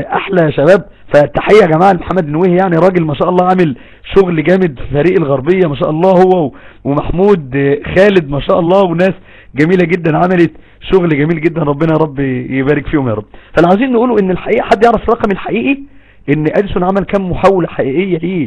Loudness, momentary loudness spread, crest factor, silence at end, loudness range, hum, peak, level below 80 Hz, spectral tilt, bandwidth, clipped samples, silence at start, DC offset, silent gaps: -11 LUFS; 7 LU; 10 dB; 0 s; 3 LU; none; 0 dBFS; -32 dBFS; -8.5 dB/octave; 10 kHz; 1%; 0 s; under 0.1%; none